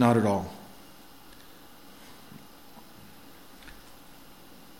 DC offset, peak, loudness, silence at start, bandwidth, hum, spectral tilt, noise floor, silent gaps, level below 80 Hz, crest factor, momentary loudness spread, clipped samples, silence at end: 0.2%; -8 dBFS; -27 LUFS; 0 s; 17 kHz; none; -7 dB/octave; -52 dBFS; none; -60 dBFS; 24 dB; 22 LU; under 0.1%; 1.1 s